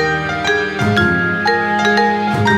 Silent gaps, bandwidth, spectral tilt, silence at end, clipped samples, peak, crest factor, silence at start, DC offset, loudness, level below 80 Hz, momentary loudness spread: none; 13.5 kHz; -5.5 dB/octave; 0 s; under 0.1%; -2 dBFS; 14 dB; 0 s; under 0.1%; -15 LUFS; -42 dBFS; 3 LU